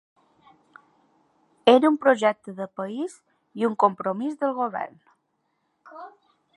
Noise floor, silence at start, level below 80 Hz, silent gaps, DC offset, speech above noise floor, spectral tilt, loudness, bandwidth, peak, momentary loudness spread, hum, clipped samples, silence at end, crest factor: -74 dBFS; 1.65 s; -78 dBFS; none; under 0.1%; 51 dB; -5.5 dB/octave; -23 LUFS; 11.5 kHz; -2 dBFS; 21 LU; none; under 0.1%; 0.45 s; 24 dB